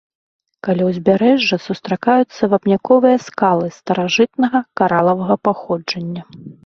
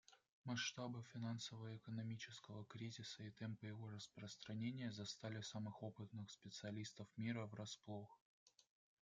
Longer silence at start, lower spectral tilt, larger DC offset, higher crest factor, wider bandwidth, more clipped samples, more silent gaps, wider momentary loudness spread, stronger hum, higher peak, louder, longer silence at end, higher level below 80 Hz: first, 0.65 s vs 0.1 s; first, -6 dB/octave vs -4.5 dB/octave; neither; about the same, 16 dB vs 20 dB; second, 7 kHz vs 9.2 kHz; neither; second, none vs 0.29-0.44 s, 8.21-8.46 s; about the same, 9 LU vs 8 LU; neither; first, 0 dBFS vs -32 dBFS; first, -16 LUFS vs -52 LUFS; second, 0.15 s vs 0.4 s; first, -58 dBFS vs -88 dBFS